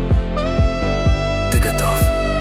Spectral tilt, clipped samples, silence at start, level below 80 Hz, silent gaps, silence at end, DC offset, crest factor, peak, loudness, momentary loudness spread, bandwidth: -5.5 dB/octave; under 0.1%; 0 s; -20 dBFS; none; 0 s; under 0.1%; 12 dB; -4 dBFS; -18 LUFS; 2 LU; 16.5 kHz